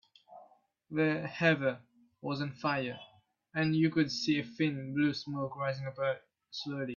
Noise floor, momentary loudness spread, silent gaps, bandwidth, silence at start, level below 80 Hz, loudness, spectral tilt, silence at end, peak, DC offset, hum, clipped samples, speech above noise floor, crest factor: -63 dBFS; 12 LU; none; 7.2 kHz; 0.3 s; -74 dBFS; -33 LUFS; -6 dB/octave; 0 s; -14 dBFS; under 0.1%; none; under 0.1%; 31 dB; 20 dB